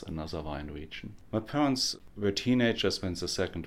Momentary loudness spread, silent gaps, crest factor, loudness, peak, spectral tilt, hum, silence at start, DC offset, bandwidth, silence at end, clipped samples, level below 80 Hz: 14 LU; none; 16 dB; -31 LUFS; -16 dBFS; -4.5 dB/octave; none; 0 s; under 0.1%; 15.5 kHz; 0 s; under 0.1%; -50 dBFS